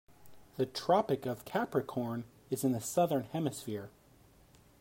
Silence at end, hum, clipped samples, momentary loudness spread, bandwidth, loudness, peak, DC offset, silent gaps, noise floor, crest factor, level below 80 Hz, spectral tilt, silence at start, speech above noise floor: 0.9 s; none; under 0.1%; 13 LU; 16 kHz; -34 LUFS; -16 dBFS; under 0.1%; none; -62 dBFS; 20 dB; -70 dBFS; -5.5 dB/octave; 0.2 s; 29 dB